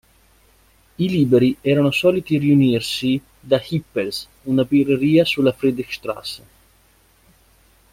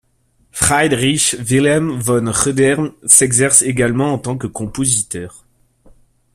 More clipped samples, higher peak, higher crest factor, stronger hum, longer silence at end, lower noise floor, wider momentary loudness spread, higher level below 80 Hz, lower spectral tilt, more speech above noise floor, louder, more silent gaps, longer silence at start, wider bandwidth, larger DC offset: neither; second, -4 dBFS vs 0 dBFS; about the same, 16 dB vs 16 dB; neither; first, 1.55 s vs 1.05 s; about the same, -56 dBFS vs -58 dBFS; about the same, 12 LU vs 14 LU; second, -54 dBFS vs -44 dBFS; first, -6.5 dB/octave vs -3.5 dB/octave; second, 38 dB vs 43 dB; second, -19 LUFS vs -14 LUFS; neither; first, 1 s vs 0.55 s; about the same, 16 kHz vs 16 kHz; neither